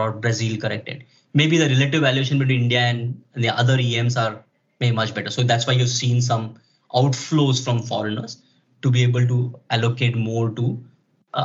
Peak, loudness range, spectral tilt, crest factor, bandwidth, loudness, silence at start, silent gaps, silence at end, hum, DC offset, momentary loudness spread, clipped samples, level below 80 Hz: -4 dBFS; 3 LU; -5 dB/octave; 16 dB; 7.8 kHz; -20 LUFS; 0 s; none; 0 s; none; under 0.1%; 11 LU; under 0.1%; -68 dBFS